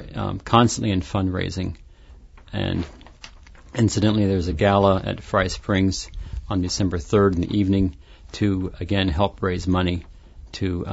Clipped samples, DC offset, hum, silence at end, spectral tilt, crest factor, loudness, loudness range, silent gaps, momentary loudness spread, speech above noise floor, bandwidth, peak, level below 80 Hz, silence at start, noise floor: under 0.1%; under 0.1%; none; 0 s; -6 dB/octave; 20 dB; -22 LUFS; 4 LU; none; 13 LU; 25 dB; 8 kHz; -2 dBFS; -38 dBFS; 0 s; -46 dBFS